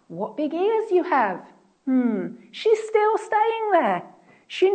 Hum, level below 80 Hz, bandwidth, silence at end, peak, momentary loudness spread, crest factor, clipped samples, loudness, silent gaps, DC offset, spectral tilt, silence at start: none; -80 dBFS; 9 kHz; 0 s; -6 dBFS; 11 LU; 16 dB; under 0.1%; -22 LUFS; none; under 0.1%; -5.5 dB/octave; 0.1 s